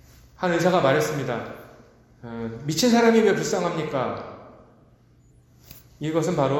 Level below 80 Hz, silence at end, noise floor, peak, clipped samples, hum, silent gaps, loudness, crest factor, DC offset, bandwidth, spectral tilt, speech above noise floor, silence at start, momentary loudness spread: -56 dBFS; 0 s; -56 dBFS; -6 dBFS; under 0.1%; none; none; -23 LUFS; 18 dB; under 0.1%; 17 kHz; -5 dB/octave; 34 dB; 0.4 s; 20 LU